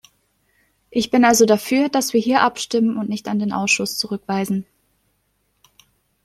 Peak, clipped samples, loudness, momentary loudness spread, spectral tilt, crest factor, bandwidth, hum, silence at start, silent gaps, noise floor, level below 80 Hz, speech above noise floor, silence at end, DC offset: -2 dBFS; under 0.1%; -19 LUFS; 10 LU; -3.5 dB/octave; 18 dB; 15.5 kHz; 50 Hz at -50 dBFS; 0.95 s; none; -67 dBFS; -60 dBFS; 49 dB; 1.65 s; under 0.1%